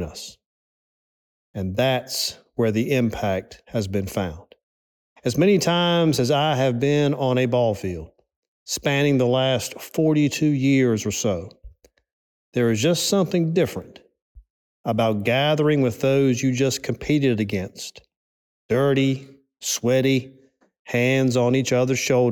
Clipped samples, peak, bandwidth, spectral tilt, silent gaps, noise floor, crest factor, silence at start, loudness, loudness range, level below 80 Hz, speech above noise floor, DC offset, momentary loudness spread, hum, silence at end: under 0.1%; -8 dBFS; 19 kHz; -5 dB/octave; 0.46-1.54 s, 4.63-5.16 s, 8.36-8.66 s, 12.13-12.52 s, 14.22-14.35 s, 14.50-14.84 s, 18.16-18.69 s, 20.79-20.85 s; -47 dBFS; 14 dB; 0 s; -21 LUFS; 4 LU; -54 dBFS; 27 dB; under 0.1%; 11 LU; none; 0 s